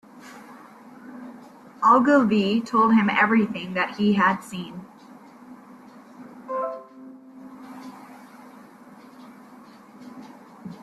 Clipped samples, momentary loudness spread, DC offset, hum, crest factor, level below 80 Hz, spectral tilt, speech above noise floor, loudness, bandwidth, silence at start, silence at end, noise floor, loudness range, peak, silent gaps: under 0.1%; 26 LU; under 0.1%; none; 20 dB; -68 dBFS; -6.5 dB/octave; 27 dB; -21 LUFS; 12.5 kHz; 0.15 s; 0.05 s; -47 dBFS; 24 LU; -6 dBFS; none